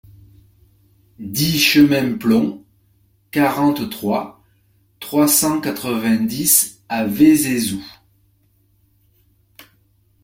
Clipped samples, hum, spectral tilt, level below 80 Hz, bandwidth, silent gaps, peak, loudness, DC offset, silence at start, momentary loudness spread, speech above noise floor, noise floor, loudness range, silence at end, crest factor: under 0.1%; none; -3.5 dB/octave; -54 dBFS; 16.5 kHz; none; 0 dBFS; -16 LUFS; under 0.1%; 1.2 s; 12 LU; 43 dB; -59 dBFS; 4 LU; 0.6 s; 18 dB